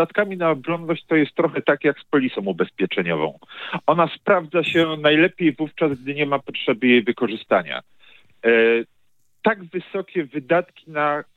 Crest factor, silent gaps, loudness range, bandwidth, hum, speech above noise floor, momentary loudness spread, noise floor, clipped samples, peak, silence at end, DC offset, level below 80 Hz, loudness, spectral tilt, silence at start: 18 dB; none; 3 LU; 8 kHz; none; 49 dB; 10 LU; -69 dBFS; under 0.1%; -2 dBFS; 0.15 s; under 0.1%; -72 dBFS; -21 LUFS; -7.5 dB/octave; 0 s